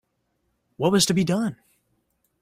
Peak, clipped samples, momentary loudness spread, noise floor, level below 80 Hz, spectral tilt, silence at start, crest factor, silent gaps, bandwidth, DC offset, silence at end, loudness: -6 dBFS; under 0.1%; 7 LU; -73 dBFS; -60 dBFS; -4.5 dB/octave; 0.8 s; 20 dB; none; 16 kHz; under 0.1%; 0.85 s; -22 LUFS